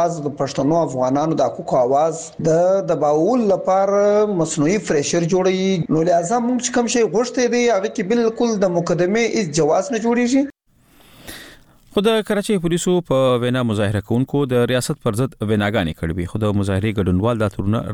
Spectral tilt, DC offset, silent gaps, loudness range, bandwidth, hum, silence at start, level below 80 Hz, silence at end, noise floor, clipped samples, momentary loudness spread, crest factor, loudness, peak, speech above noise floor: -5.5 dB/octave; under 0.1%; none; 3 LU; 16.5 kHz; none; 0 s; -46 dBFS; 0 s; -52 dBFS; under 0.1%; 5 LU; 14 dB; -18 LUFS; -4 dBFS; 35 dB